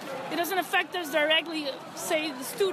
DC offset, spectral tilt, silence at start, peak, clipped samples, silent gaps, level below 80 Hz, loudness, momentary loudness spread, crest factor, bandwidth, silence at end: under 0.1%; -2 dB/octave; 0 s; -10 dBFS; under 0.1%; none; -80 dBFS; -28 LUFS; 10 LU; 18 dB; 14 kHz; 0 s